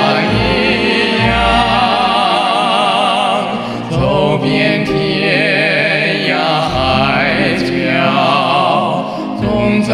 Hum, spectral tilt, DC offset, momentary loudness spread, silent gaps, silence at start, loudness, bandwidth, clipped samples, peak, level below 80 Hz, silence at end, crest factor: none; -5.5 dB/octave; under 0.1%; 4 LU; none; 0 s; -12 LUFS; 13 kHz; under 0.1%; 0 dBFS; -32 dBFS; 0 s; 12 dB